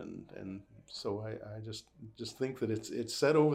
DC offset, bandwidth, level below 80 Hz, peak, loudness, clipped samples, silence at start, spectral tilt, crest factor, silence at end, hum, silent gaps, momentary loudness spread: under 0.1%; 15.5 kHz; -70 dBFS; -16 dBFS; -37 LUFS; under 0.1%; 0 s; -5.5 dB/octave; 18 dB; 0 s; none; none; 16 LU